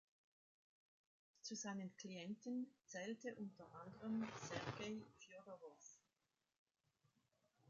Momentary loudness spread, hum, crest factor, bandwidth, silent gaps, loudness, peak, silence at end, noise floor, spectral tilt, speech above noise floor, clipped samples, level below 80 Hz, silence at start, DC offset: 13 LU; none; 20 dB; 7.6 kHz; 6.58-6.66 s; -51 LUFS; -34 dBFS; 0 s; under -90 dBFS; -4.5 dB/octave; over 39 dB; under 0.1%; -84 dBFS; 1.45 s; under 0.1%